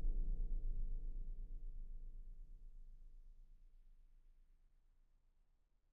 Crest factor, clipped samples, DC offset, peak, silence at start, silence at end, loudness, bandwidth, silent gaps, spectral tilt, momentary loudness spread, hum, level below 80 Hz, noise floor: 16 dB; under 0.1%; under 0.1%; -30 dBFS; 0 s; 1.4 s; -52 LUFS; 0.8 kHz; none; -13 dB/octave; 19 LU; none; -46 dBFS; -76 dBFS